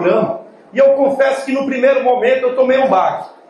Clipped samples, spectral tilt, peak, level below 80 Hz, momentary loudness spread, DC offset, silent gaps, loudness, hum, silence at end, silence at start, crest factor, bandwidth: under 0.1%; -6 dB/octave; -2 dBFS; -64 dBFS; 7 LU; under 0.1%; none; -14 LUFS; none; 0.2 s; 0 s; 12 dB; 11.5 kHz